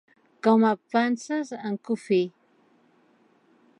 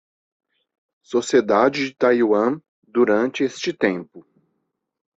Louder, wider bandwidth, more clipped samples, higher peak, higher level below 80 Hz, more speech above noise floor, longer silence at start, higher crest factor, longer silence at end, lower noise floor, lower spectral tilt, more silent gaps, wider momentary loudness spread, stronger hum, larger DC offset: second, -25 LUFS vs -20 LUFS; first, 10.5 kHz vs 8 kHz; neither; second, -8 dBFS vs -2 dBFS; second, -84 dBFS vs -66 dBFS; second, 39 dB vs 56 dB; second, 0.45 s vs 1.1 s; about the same, 18 dB vs 18 dB; first, 1.5 s vs 0.95 s; second, -62 dBFS vs -75 dBFS; about the same, -6 dB/octave vs -5 dB/octave; second, none vs 2.68-2.82 s; first, 11 LU vs 8 LU; neither; neither